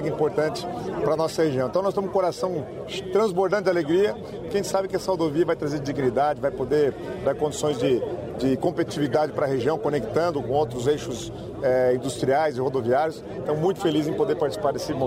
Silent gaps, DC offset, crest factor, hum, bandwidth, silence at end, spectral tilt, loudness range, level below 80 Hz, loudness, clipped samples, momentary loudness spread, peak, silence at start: none; under 0.1%; 16 dB; none; 16 kHz; 0 s; -6 dB/octave; 1 LU; -52 dBFS; -24 LUFS; under 0.1%; 6 LU; -8 dBFS; 0 s